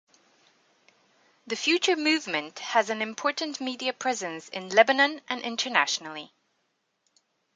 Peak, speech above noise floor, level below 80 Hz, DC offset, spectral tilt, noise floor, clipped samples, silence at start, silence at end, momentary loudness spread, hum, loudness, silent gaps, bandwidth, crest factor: -2 dBFS; 49 dB; -84 dBFS; under 0.1%; -1.5 dB/octave; -75 dBFS; under 0.1%; 1.45 s; 1.3 s; 11 LU; none; -26 LUFS; none; 9.6 kHz; 26 dB